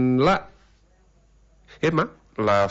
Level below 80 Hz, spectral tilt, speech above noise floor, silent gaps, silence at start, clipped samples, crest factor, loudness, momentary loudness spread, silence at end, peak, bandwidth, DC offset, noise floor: -48 dBFS; -7 dB/octave; 38 dB; none; 0 s; under 0.1%; 16 dB; -23 LUFS; 7 LU; 0 s; -8 dBFS; 8 kHz; under 0.1%; -58 dBFS